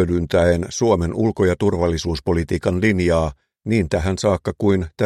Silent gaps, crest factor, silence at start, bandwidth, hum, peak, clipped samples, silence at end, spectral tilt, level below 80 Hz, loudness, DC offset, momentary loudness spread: none; 16 dB; 0 s; 12.5 kHz; none; -4 dBFS; under 0.1%; 0 s; -6.5 dB/octave; -34 dBFS; -19 LUFS; under 0.1%; 4 LU